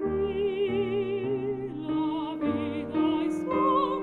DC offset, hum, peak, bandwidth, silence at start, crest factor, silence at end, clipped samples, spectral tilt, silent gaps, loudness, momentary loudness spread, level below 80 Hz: under 0.1%; none; -14 dBFS; 9.8 kHz; 0 s; 14 dB; 0 s; under 0.1%; -7.5 dB/octave; none; -28 LUFS; 6 LU; -54 dBFS